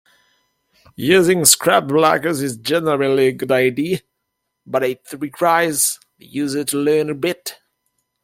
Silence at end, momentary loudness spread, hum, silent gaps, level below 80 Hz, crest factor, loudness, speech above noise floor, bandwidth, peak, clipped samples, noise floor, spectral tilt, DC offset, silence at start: 0.7 s; 13 LU; none; none; -60 dBFS; 18 dB; -17 LUFS; 58 dB; 16.5 kHz; 0 dBFS; under 0.1%; -75 dBFS; -3.5 dB/octave; under 0.1%; 1 s